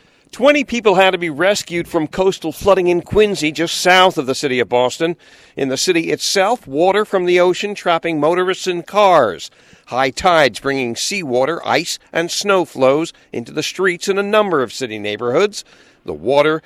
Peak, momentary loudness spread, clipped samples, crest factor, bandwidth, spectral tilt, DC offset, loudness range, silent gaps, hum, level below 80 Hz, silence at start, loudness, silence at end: 0 dBFS; 10 LU; under 0.1%; 16 dB; 15.5 kHz; -3.5 dB/octave; under 0.1%; 3 LU; none; none; -48 dBFS; 0.35 s; -16 LUFS; 0.05 s